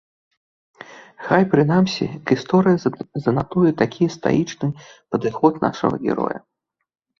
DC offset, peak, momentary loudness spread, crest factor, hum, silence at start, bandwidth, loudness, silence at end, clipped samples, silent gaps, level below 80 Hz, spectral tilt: under 0.1%; -2 dBFS; 10 LU; 18 dB; none; 0.8 s; 7.2 kHz; -20 LUFS; 0.8 s; under 0.1%; none; -54 dBFS; -7 dB/octave